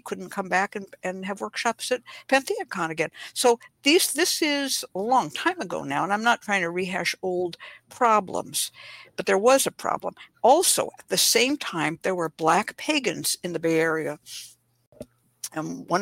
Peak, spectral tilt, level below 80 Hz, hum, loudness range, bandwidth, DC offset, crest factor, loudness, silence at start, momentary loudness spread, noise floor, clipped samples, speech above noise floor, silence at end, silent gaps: -6 dBFS; -2.5 dB/octave; -70 dBFS; none; 4 LU; 16.5 kHz; under 0.1%; 18 dB; -24 LUFS; 0.05 s; 13 LU; -47 dBFS; under 0.1%; 22 dB; 0 s; 14.87-14.92 s